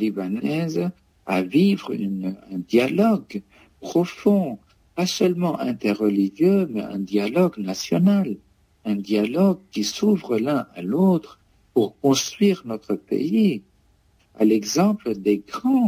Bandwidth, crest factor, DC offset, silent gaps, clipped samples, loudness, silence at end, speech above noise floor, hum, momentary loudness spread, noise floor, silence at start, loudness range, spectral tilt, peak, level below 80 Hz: 16 kHz; 16 dB; under 0.1%; none; under 0.1%; -22 LUFS; 0 s; 39 dB; none; 10 LU; -60 dBFS; 0 s; 1 LU; -6 dB/octave; -6 dBFS; -62 dBFS